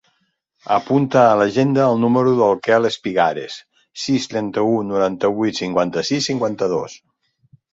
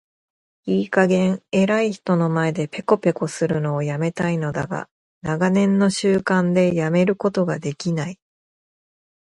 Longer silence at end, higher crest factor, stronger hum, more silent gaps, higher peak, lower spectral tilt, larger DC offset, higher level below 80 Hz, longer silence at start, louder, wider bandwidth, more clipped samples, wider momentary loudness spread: second, 0.75 s vs 1.2 s; about the same, 16 dB vs 18 dB; neither; second, none vs 4.91-5.21 s; about the same, -2 dBFS vs -2 dBFS; about the same, -5.5 dB/octave vs -6.5 dB/octave; neither; about the same, -58 dBFS vs -58 dBFS; about the same, 0.7 s vs 0.65 s; about the same, -18 LUFS vs -20 LUFS; second, 8 kHz vs 11.5 kHz; neither; first, 12 LU vs 9 LU